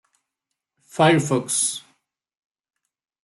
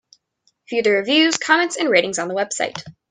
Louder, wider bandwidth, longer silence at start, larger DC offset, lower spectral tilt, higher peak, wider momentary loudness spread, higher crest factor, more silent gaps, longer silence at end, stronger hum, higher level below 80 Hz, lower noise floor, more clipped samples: about the same, -20 LUFS vs -18 LUFS; first, 12.5 kHz vs 10 kHz; first, 0.95 s vs 0.7 s; neither; first, -4 dB/octave vs -2 dB/octave; second, -4 dBFS vs 0 dBFS; first, 16 LU vs 10 LU; about the same, 22 dB vs 20 dB; neither; first, 1.45 s vs 0.2 s; neither; about the same, -68 dBFS vs -68 dBFS; first, -83 dBFS vs -66 dBFS; neither